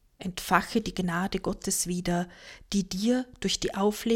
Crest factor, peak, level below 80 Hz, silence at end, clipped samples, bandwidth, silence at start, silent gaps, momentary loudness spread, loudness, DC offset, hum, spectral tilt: 22 dB; -6 dBFS; -48 dBFS; 0 s; under 0.1%; 17 kHz; 0.2 s; none; 7 LU; -29 LUFS; under 0.1%; none; -4 dB/octave